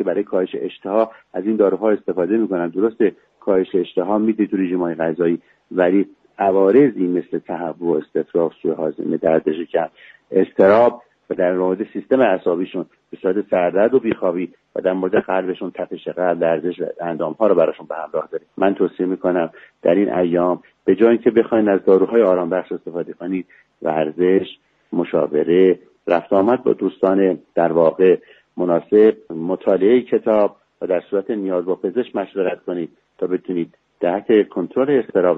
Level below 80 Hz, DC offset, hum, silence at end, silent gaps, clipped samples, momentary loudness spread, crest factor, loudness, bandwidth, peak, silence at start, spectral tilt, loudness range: -62 dBFS; under 0.1%; none; 0 s; none; under 0.1%; 12 LU; 18 dB; -19 LUFS; 4.4 kHz; 0 dBFS; 0 s; -9.5 dB/octave; 4 LU